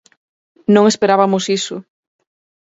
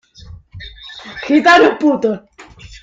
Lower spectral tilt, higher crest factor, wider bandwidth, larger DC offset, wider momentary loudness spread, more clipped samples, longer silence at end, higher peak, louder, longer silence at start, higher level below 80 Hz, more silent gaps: about the same, -5 dB/octave vs -4.5 dB/octave; about the same, 16 dB vs 16 dB; about the same, 8 kHz vs 7.8 kHz; neither; second, 13 LU vs 24 LU; neither; first, 0.8 s vs 0.4 s; about the same, 0 dBFS vs 0 dBFS; second, -15 LUFS vs -12 LUFS; first, 0.7 s vs 0.55 s; second, -64 dBFS vs -44 dBFS; neither